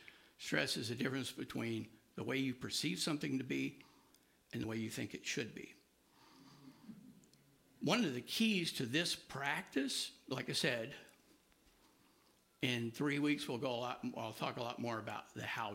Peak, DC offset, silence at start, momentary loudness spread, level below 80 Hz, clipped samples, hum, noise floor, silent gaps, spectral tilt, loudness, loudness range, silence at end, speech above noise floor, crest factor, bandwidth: -20 dBFS; under 0.1%; 0 s; 13 LU; -78 dBFS; under 0.1%; none; -72 dBFS; none; -4 dB/octave; -40 LUFS; 8 LU; 0 s; 32 dB; 22 dB; 16 kHz